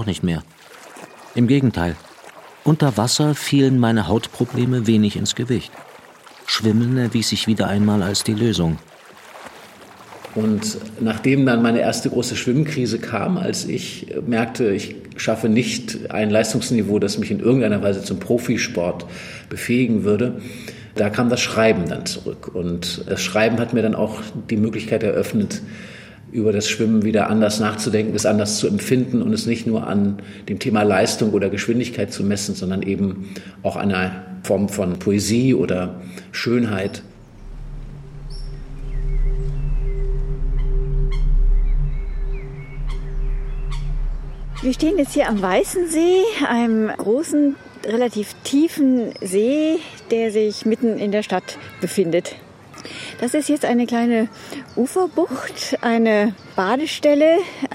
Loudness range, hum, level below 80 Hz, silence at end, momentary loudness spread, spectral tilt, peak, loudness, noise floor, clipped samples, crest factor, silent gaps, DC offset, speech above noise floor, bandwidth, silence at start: 7 LU; none; -30 dBFS; 0 s; 14 LU; -5.5 dB/octave; -2 dBFS; -20 LUFS; -44 dBFS; under 0.1%; 16 dB; none; under 0.1%; 24 dB; 16 kHz; 0 s